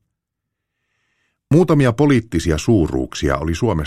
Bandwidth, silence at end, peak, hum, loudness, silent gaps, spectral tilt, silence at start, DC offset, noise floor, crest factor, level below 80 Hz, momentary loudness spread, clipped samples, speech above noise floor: 14 kHz; 0 s; -2 dBFS; none; -17 LUFS; none; -7 dB/octave; 1.5 s; under 0.1%; -79 dBFS; 16 dB; -34 dBFS; 6 LU; under 0.1%; 64 dB